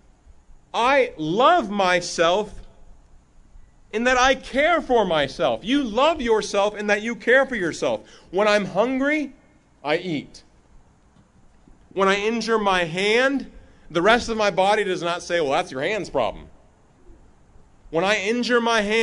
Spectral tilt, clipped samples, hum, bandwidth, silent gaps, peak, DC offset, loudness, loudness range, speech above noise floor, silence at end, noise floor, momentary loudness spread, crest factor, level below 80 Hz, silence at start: -4 dB/octave; under 0.1%; none; 11 kHz; none; -2 dBFS; under 0.1%; -21 LUFS; 5 LU; 34 dB; 0 s; -55 dBFS; 9 LU; 20 dB; -48 dBFS; 0.75 s